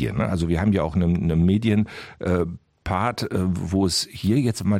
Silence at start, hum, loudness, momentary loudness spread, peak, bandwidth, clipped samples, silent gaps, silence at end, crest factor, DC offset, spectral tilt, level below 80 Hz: 0 s; none; -23 LUFS; 7 LU; -6 dBFS; 16 kHz; under 0.1%; none; 0 s; 14 dB; under 0.1%; -6 dB/octave; -40 dBFS